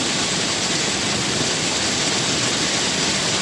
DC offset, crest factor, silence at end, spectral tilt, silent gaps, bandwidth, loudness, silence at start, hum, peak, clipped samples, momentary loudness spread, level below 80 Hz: under 0.1%; 14 dB; 0 s; -2 dB/octave; none; 11.5 kHz; -19 LUFS; 0 s; none; -6 dBFS; under 0.1%; 1 LU; -50 dBFS